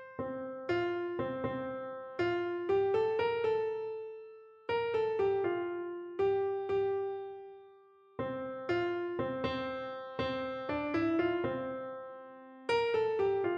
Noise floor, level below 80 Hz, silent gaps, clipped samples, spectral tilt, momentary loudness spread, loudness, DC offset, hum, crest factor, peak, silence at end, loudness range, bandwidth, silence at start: -60 dBFS; -66 dBFS; none; under 0.1%; -7 dB/octave; 13 LU; -34 LUFS; under 0.1%; none; 14 dB; -20 dBFS; 0 s; 3 LU; 8.6 kHz; 0 s